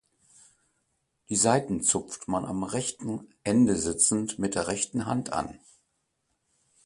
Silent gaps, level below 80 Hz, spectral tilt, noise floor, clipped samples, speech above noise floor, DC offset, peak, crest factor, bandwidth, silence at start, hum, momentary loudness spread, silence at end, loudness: none; -56 dBFS; -4 dB/octave; -77 dBFS; under 0.1%; 49 dB; under 0.1%; -8 dBFS; 22 dB; 11.5 kHz; 1.3 s; none; 10 LU; 1.3 s; -27 LUFS